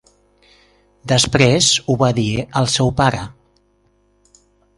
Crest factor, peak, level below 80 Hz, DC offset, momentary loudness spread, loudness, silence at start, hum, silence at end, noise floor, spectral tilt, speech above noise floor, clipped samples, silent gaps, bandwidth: 18 dB; 0 dBFS; -42 dBFS; under 0.1%; 12 LU; -15 LUFS; 1.05 s; 50 Hz at -45 dBFS; 1.5 s; -59 dBFS; -4 dB/octave; 44 dB; under 0.1%; none; 11.5 kHz